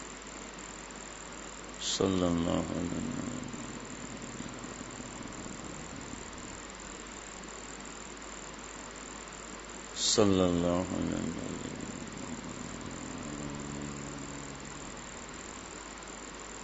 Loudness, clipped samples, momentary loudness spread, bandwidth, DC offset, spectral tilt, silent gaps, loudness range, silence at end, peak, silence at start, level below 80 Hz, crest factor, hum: -36 LUFS; under 0.1%; 14 LU; 8 kHz; under 0.1%; -4 dB/octave; none; 11 LU; 0 s; -12 dBFS; 0 s; -56 dBFS; 26 dB; none